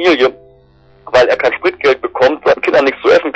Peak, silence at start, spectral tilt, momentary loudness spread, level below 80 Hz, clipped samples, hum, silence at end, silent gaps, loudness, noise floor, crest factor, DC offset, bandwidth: -2 dBFS; 0 s; -4.5 dB/octave; 3 LU; -48 dBFS; under 0.1%; 50 Hz at -55 dBFS; 0 s; none; -12 LUFS; -46 dBFS; 10 dB; under 0.1%; 8.2 kHz